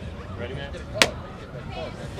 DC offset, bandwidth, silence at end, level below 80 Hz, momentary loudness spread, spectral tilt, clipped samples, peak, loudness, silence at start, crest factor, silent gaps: under 0.1%; 15.5 kHz; 0 s; -42 dBFS; 16 LU; -3 dB/octave; under 0.1%; 0 dBFS; -27 LUFS; 0 s; 30 dB; none